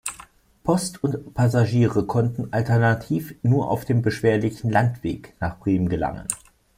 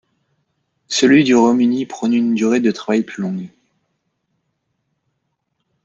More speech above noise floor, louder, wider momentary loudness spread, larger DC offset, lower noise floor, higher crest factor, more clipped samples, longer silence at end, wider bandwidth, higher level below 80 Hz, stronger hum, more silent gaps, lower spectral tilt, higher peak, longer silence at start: second, 27 dB vs 57 dB; second, -23 LUFS vs -16 LUFS; second, 10 LU vs 13 LU; neither; second, -49 dBFS vs -72 dBFS; about the same, 18 dB vs 18 dB; neither; second, 0.4 s vs 2.4 s; first, 15.5 kHz vs 8 kHz; first, -48 dBFS vs -62 dBFS; neither; neither; first, -6.5 dB/octave vs -5 dB/octave; about the same, -4 dBFS vs -2 dBFS; second, 0.05 s vs 0.9 s